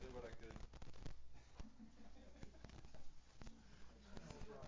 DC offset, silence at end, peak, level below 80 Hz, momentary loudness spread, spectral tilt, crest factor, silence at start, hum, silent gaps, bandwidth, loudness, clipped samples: under 0.1%; 0 s; -36 dBFS; -62 dBFS; 9 LU; -5.5 dB/octave; 16 dB; 0 s; none; none; 7.6 kHz; -61 LUFS; under 0.1%